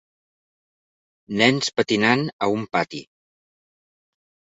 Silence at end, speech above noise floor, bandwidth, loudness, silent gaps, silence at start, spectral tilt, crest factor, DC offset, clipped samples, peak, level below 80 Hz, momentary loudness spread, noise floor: 1.55 s; over 69 dB; 8 kHz; -21 LUFS; 2.33-2.39 s; 1.3 s; -4.5 dB/octave; 24 dB; under 0.1%; under 0.1%; -2 dBFS; -64 dBFS; 12 LU; under -90 dBFS